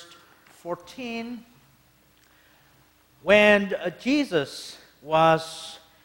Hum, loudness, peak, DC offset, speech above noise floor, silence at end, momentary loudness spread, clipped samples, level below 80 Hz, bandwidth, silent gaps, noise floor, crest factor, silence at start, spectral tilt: none; -22 LUFS; -4 dBFS; under 0.1%; 36 dB; 0.25 s; 23 LU; under 0.1%; -62 dBFS; 16.5 kHz; none; -60 dBFS; 22 dB; 0 s; -5 dB/octave